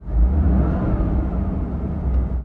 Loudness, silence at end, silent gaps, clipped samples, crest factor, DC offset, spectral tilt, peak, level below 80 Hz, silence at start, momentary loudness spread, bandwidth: -22 LUFS; 0 s; none; under 0.1%; 14 dB; under 0.1%; -12 dB/octave; -6 dBFS; -20 dBFS; 0 s; 6 LU; 2.9 kHz